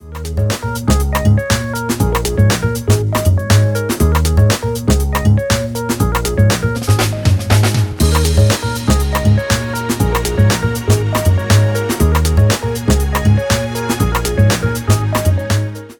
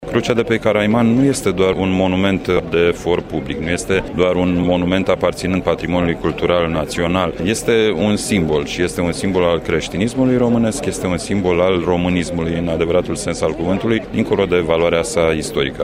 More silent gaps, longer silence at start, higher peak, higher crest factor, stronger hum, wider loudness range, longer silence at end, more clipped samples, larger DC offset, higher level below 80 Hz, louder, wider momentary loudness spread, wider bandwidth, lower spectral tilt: neither; about the same, 0.05 s vs 0 s; about the same, 0 dBFS vs -2 dBFS; about the same, 14 dB vs 14 dB; neither; about the same, 1 LU vs 1 LU; about the same, 0.05 s vs 0 s; neither; neither; first, -22 dBFS vs -36 dBFS; first, -14 LUFS vs -17 LUFS; about the same, 4 LU vs 5 LU; first, 19.5 kHz vs 16 kHz; about the same, -5.5 dB/octave vs -5.5 dB/octave